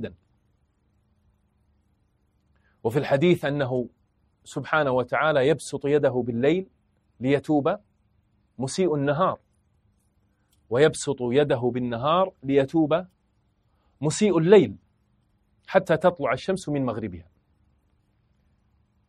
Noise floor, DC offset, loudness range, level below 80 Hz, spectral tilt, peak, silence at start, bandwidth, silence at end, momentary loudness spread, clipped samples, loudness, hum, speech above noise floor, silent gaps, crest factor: -68 dBFS; under 0.1%; 5 LU; -60 dBFS; -6 dB/octave; -4 dBFS; 0 s; 12.5 kHz; 1.85 s; 12 LU; under 0.1%; -24 LUFS; none; 45 dB; none; 22 dB